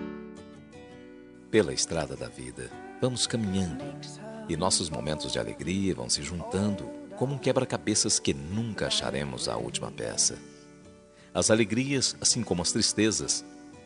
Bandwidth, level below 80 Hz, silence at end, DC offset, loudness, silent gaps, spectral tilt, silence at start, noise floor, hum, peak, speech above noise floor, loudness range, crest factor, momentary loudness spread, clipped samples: 11 kHz; -56 dBFS; 0 s; under 0.1%; -28 LUFS; none; -3.5 dB/octave; 0 s; -53 dBFS; none; -8 dBFS; 24 dB; 4 LU; 22 dB; 17 LU; under 0.1%